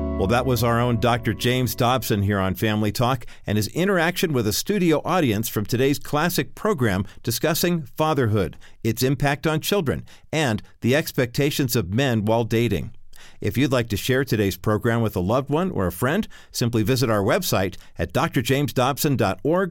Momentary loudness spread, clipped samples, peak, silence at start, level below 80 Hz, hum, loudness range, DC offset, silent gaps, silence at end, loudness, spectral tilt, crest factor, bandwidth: 6 LU; under 0.1%; -6 dBFS; 0 s; -42 dBFS; none; 1 LU; under 0.1%; none; 0 s; -22 LUFS; -5.5 dB/octave; 16 dB; 17 kHz